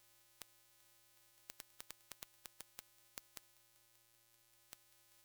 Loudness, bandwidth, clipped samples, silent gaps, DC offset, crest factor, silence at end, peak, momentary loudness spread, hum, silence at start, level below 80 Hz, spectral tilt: -58 LUFS; over 20 kHz; under 0.1%; none; under 0.1%; 42 dB; 0 s; -18 dBFS; 14 LU; none; 0 s; -86 dBFS; 0 dB/octave